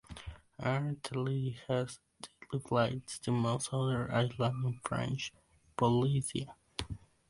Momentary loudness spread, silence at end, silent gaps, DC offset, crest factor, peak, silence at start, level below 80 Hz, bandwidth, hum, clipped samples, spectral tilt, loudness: 15 LU; 0.3 s; none; under 0.1%; 20 dB; -16 dBFS; 0.1 s; -58 dBFS; 11.5 kHz; none; under 0.1%; -6 dB/octave; -35 LUFS